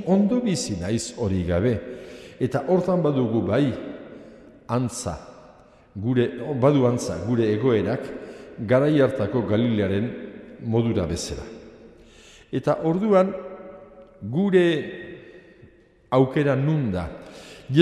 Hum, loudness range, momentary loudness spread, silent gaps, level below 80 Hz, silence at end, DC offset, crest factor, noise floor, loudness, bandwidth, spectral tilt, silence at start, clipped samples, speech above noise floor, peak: none; 4 LU; 20 LU; none; -52 dBFS; 0 s; under 0.1%; 22 dB; -53 dBFS; -23 LUFS; 13 kHz; -6.5 dB/octave; 0 s; under 0.1%; 31 dB; -2 dBFS